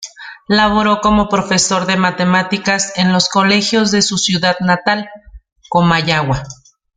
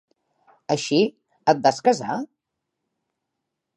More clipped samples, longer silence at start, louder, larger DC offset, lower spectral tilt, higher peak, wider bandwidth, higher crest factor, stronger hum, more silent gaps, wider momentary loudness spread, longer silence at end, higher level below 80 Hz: neither; second, 0 s vs 0.7 s; first, -13 LUFS vs -22 LUFS; neither; about the same, -4 dB/octave vs -4.5 dB/octave; about the same, 0 dBFS vs -2 dBFS; second, 9.6 kHz vs 11.5 kHz; second, 14 dB vs 22 dB; neither; neither; second, 7 LU vs 13 LU; second, 0.45 s vs 1.5 s; first, -40 dBFS vs -72 dBFS